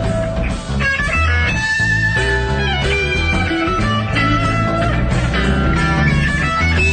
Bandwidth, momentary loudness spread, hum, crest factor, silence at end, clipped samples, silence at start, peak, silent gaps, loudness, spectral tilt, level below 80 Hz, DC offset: 9.4 kHz; 3 LU; none; 12 dB; 0 s; under 0.1%; 0 s; -4 dBFS; none; -16 LUFS; -5.5 dB/octave; -22 dBFS; under 0.1%